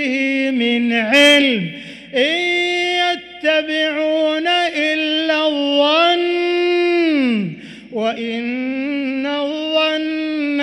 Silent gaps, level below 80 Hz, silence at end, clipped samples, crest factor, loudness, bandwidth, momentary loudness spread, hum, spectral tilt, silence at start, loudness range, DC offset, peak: none; -62 dBFS; 0 s; under 0.1%; 14 dB; -16 LUFS; 15.5 kHz; 9 LU; none; -4 dB/octave; 0 s; 4 LU; under 0.1%; -2 dBFS